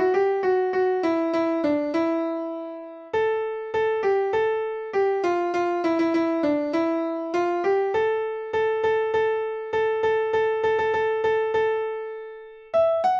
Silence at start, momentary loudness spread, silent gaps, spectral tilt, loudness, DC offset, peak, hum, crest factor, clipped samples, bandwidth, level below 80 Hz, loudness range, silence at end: 0 s; 6 LU; none; -6 dB/octave; -24 LUFS; under 0.1%; -10 dBFS; none; 12 dB; under 0.1%; 7.2 kHz; -62 dBFS; 2 LU; 0 s